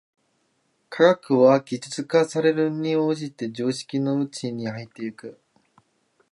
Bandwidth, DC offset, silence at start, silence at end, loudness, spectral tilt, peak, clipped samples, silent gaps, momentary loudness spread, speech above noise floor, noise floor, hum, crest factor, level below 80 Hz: 11.5 kHz; under 0.1%; 0.9 s; 1 s; -23 LUFS; -6 dB/octave; -4 dBFS; under 0.1%; none; 16 LU; 47 dB; -69 dBFS; none; 20 dB; -74 dBFS